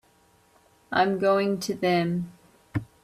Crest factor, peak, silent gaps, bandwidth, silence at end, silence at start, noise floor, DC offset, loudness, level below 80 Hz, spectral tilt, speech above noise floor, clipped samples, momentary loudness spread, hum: 18 dB; -10 dBFS; none; 15.5 kHz; 0.2 s; 0.9 s; -61 dBFS; under 0.1%; -26 LUFS; -60 dBFS; -6 dB/octave; 37 dB; under 0.1%; 12 LU; none